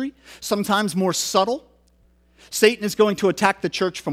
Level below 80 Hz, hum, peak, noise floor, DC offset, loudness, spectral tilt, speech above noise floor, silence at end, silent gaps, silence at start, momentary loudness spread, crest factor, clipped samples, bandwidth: -58 dBFS; none; -2 dBFS; -58 dBFS; under 0.1%; -21 LUFS; -4 dB/octave; 37 dB; 0 s; none; 0 s; 11 LU; 20 dB; under 0.1%; 16 kHz